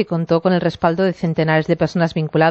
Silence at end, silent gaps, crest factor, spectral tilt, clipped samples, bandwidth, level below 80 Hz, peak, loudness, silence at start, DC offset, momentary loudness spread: 0 s; none; 14 dB; -8 dB/octave; under 0.1%; 7.2 kHz; -50 dBFS; -2 dBFS; -18 LUFS; 0 s; under 0.1%; 2 LU